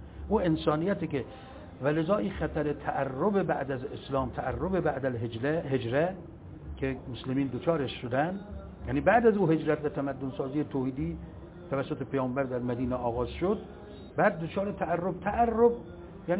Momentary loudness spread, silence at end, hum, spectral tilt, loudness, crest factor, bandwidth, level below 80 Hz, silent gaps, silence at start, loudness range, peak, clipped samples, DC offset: 14 LU; 0 s; none; -6 dB/octave; -30 LUFS; 20 dB; 4 kHz; -48 dBFS; none; 0 s; 4 LU; -10 dBFS; under 0.1%; under 0.1%